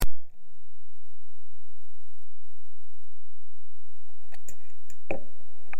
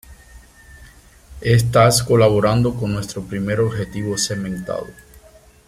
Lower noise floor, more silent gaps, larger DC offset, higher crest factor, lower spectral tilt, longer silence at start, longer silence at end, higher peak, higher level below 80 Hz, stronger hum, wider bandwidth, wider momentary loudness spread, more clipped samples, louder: first, -70 dBFS vs -47 dBFS; neither; first, 10% vs under 0.1%; about the same, 16 dB vs 18 dB; about the same, -5.5 dB/octave vs -5 dB/octave; about the same, 0 s vs 0.1 s; second, 0 s vs 0.75 s; second, -6 dBFS vs -2 dBFS; about the same, -40 dBFS vs -42 dBFS; neither; about the same, 16.5 kHz vs 15.5 kHz; first, 22 LU vs 13 LU; neither; second, -41 LUFS vs -18 LUFS